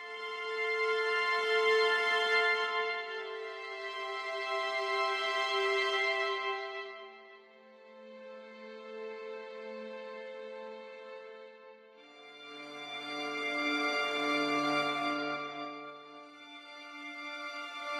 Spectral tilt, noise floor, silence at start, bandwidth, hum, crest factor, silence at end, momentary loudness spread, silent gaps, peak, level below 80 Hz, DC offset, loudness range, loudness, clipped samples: -2 dB/octave; -57 dBFS; 0 s; 14.5 kHz; none; 18 dB; 0 s; 21 LU; none; -16 dBFS; under -90 dBFS; under 0.1%; 16 LU; -32 LUFS; under 0.1%